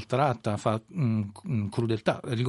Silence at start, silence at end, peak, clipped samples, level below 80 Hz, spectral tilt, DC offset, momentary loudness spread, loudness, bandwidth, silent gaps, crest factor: 0 s; 0 s; -10 dBFS; under 0.1%; -64 dBFS; -7.5 dB/octave; under 0.1%; 5 LU; -29 LUFS; 11.5 kHz; none; 18 dB